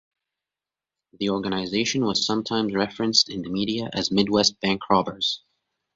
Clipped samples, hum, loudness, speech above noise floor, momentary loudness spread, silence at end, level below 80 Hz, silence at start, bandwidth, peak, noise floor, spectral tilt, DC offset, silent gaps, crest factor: under 0.1%; none; -23 LUFS; 66 dB; 6 LU; 0.6 s; -58 dBFS; 1.2 s; 7.8 kHz; -4 dBFS; -90 dBFS; -3.5 dB/octave; under 0.1%; none; 22 dB